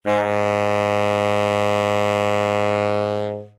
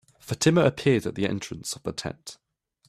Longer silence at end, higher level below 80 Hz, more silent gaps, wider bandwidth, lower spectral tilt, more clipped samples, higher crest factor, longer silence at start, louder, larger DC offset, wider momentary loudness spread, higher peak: second, 0.1 s vs 0.55 s; about the same, -60 dBFS vs -58 dBFS; neither; about the same, 14 kHz vs 14.5 kHz; about the same, -5.5 dB/octave vs -5 dB/octave; neither; second, 12 dB vs 20 dB; second, 0.05 s vs 0.25 s; first, -20 LUFS vs -25 LUFS; neither; second, 2 LU vs 15 LU; about the same, -8 dBFS vs -8 dBFS